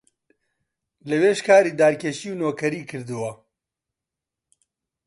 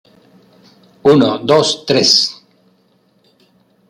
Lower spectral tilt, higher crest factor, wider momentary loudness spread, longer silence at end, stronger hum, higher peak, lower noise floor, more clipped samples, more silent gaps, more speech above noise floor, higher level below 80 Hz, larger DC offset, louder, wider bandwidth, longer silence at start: about the same, -5 dB/octave vs -4 dB/octave; about the same, 20 dB vs 16 dB; first, 16 LU vs 6 LU; first, 1.7 s vs 1.55 s; neither; second, -4 dBFS vs 0 dBFS; first, -87 dBFS vs -56 dBFS; neither; neither; first, 66 dB vs 44 dB; second, -70 dBFS vs -58 dBFS; neither; second, -21 LUFS vs -12 LUFS; second, 11.5 kHz vs 15.5 kHz; about the same, 1.05 s vs 1.05 s